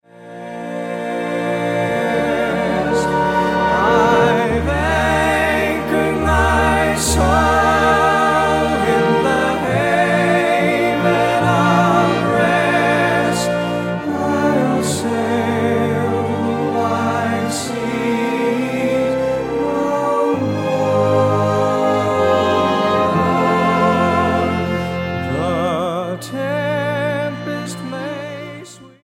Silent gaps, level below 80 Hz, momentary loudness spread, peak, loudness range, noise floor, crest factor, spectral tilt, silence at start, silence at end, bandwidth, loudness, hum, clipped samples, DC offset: none; -34 dBFS; 8 LU; -2 dBFS; 4 LU; -37 dBFS; 14 dB; -5.5 dB/octave; 0.2 s; 0.15 s; 16.5 kHz; -16 LUFS; none; under 0.1%; under 0.1%